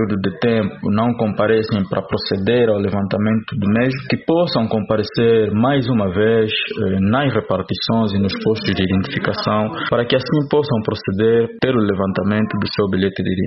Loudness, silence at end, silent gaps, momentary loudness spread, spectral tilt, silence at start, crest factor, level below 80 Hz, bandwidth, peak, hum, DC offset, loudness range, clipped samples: -18 LUFS; 0 s; none; 4 LU; -9.5 dB/octave; 0 s; 16 dB; -48 dBFS; 6 kHz; -2 dBFS; none; under 0.1%; 2 LU; under 0.1%